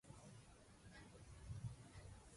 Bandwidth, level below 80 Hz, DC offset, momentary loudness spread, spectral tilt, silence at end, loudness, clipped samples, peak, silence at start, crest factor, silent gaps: 11.5 kHz; -66 dBFS; under 0.1%; 11 LU; -5.5 dB/octave; 0 s; -59 LUFS; under 0.1%; -38 dBFS; 0.05 s; 20 dB; none